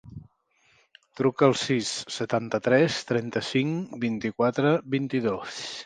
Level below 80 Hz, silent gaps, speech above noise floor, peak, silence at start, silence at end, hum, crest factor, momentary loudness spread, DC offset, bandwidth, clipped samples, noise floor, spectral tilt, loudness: -64 dBFS; none; 40 dB; -6 dBFS; 0.05 s; 0 s; none; 22 dB; 8 LU; under 0.1%; 9.8 kHz; under 0.1%; -65 dBFS; -5 dB/octave; -26 LUFS